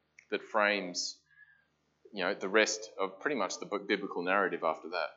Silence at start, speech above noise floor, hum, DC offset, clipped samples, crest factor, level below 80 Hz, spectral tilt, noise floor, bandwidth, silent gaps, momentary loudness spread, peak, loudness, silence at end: 0.3 s; 40 dB; none; under 0.1%; under 0.1%; 22 dB; -88 dBFS; -2.5 dB/octave; -73 dBFS; 8.2 kHz; none; 10 LU; -10 dBFS; -32 LUFS; 0.05 s